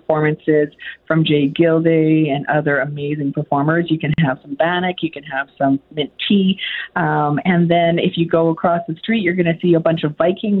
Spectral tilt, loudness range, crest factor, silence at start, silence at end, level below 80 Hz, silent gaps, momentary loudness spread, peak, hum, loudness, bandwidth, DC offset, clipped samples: -10.5 dB/octave; 3 LU; 14 dB; 0.1 s; 0 s; -54 dBFS; none; 7 LU; -2 dBFS; none; -17 LUFS; 4.2 kHz; under 0.1%; under 0.1%